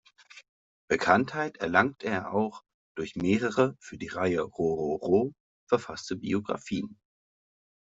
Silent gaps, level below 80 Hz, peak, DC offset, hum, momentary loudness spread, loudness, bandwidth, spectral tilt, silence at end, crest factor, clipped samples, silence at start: 0.49-0.88 s, 2.74-2.95 s, 5.40-5.67 s; -64 dBFS; -6 dBFS; under 0.1%; none; 12 LU; -29 LUFS; 7.8 kHz; -6 dB/octave; 1 s; 24 dB; under 0.1%; 0.35 s